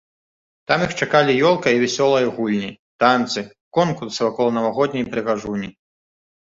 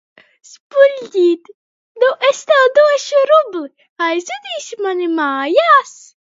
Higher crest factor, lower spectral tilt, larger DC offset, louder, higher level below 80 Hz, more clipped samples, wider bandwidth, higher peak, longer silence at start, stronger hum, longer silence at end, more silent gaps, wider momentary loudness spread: about the same, 18 dB vs 14 dB; first, -5 dB/octave vs -1.5 dB/octave; neither; second, -19 LUFS vs -14 LUFS; first, -58 dBFS vs -70 dBFS; neither; about the same, 8 kHz vs 7.8 kHz; about the same, -2 dBFS vs 0 dBFS; about the same, 0.7 s vs 0.75 s; neither; first, 0.8 s vs 0.4 s; second, 2.79-2.99 s, 3.61-3.71 s vs 1.54-1.95 s, 3.89-3.96 s; second, 10 LU vs 14 LU